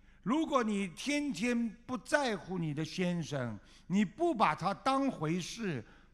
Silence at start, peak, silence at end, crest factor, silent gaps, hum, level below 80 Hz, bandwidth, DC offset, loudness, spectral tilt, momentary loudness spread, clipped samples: 0.25 s; -14 dBFS; 0.2 s; 20 dB; none; none; -62 dBFS; 13.5 kHz; under 0.1%; -34 LUFS; -5.5 dB/octave; 8 LU; under 0.1%